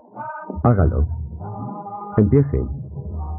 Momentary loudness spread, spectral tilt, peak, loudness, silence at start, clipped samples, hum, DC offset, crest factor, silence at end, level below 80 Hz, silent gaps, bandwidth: 15 LU; -13 dB/octave; -4 dBFS; -21 LUFS; 0.15 s; under 0.1%; none; under 0.1%; 18 dB; 0 s; -30 dBFS; none; 2.6 kHz